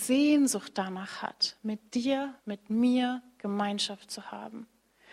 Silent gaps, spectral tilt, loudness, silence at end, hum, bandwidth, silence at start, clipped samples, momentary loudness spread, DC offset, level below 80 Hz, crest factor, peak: none; -3.5 dB/octave; -30 LUFS; 0.5 s; none; 15.5 kHz; 0 s; under 0.1%; 16 LU; under 0.1%; -76 dBFS; 16 dB; -14 dBFS